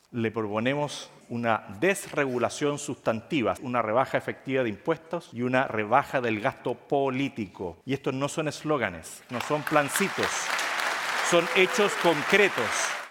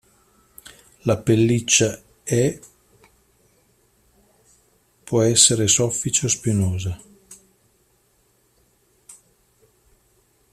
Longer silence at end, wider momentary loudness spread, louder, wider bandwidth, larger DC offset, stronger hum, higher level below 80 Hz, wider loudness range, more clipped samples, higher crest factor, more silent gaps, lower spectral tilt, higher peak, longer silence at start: second, 0 s vs 1.4 s; second, 9 LU vs 15 LU; second, -27 LUFS vs -19 LUFS; first, 17 kHz vs 14.5 kHz; neither; neither; second, -66 dBFS vs -54 dBFS; second, 5 LU vs 10 LU; neither; about the same, 22 dB vs 24 dB; neither; about the same, -4 dB/octave vs -3.5 dB/octave; second, -4 dBFS vs 0 dBFS; second, 0.1 s vs 1.05 s